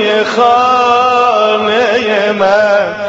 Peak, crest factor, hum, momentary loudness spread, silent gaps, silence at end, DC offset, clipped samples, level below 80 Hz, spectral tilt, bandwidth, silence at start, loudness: 0 dBFS; 10 dB; none; 2 LU; none; 0 s; under 0.1%; under 0.1%; -54 dBFS; -1 dB/octave; 8 kHz; 0 s; -10 LUFS